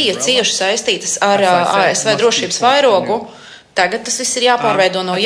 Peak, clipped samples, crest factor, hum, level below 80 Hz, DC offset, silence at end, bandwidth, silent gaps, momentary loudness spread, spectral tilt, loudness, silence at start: 0 dBFS; under 0.1%; 14 dB; none; -60 dBFS; under 0.1%; 0 s; 11 kHz; none; 5 LU; -2 dB/octave; -13 LUFS; 0 s